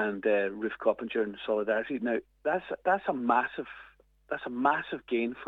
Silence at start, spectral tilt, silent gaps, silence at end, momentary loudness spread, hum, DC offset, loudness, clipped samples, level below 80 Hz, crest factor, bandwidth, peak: 0 s; -7.5 dB/octave; none; 0 s; 9 LU; none; under 0.1%; -30 LUFS; under 0.1%; -68 dBFS; 20 dB; 4.4 kHz; -12 dBFS